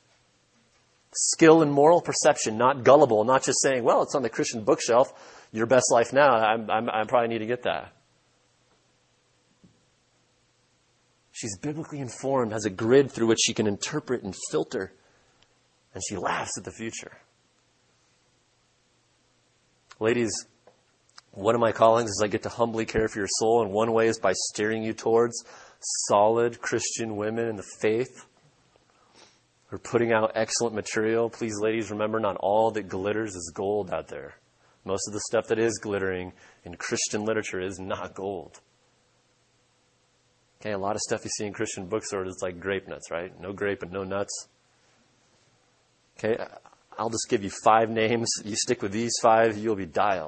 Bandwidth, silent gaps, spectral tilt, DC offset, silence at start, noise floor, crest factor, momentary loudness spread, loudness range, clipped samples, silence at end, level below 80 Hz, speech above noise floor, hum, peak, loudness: 8.8 kHz; none; -4 dB/octave; under 0.1%; 1.15 s; -67 dBFS; 24 dB; 14 LU; 13 LU; under 0.1%; 0 s; -62 dBFS; 42 dB; none; -2 dBFS; -25 LUFS